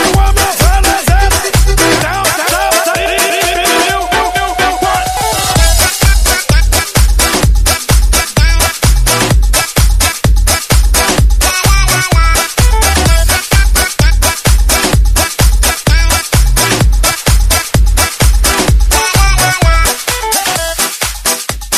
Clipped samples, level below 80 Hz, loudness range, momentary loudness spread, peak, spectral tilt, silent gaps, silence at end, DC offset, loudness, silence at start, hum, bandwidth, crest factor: 0.1%; -12 dBFS; 1 LU; 3 LU; 0 dBFS; -3 dB/octave; none; 0 s; under 0.1%; -10 LUFS; 0 s; none; 15.5 kHz; 10 dB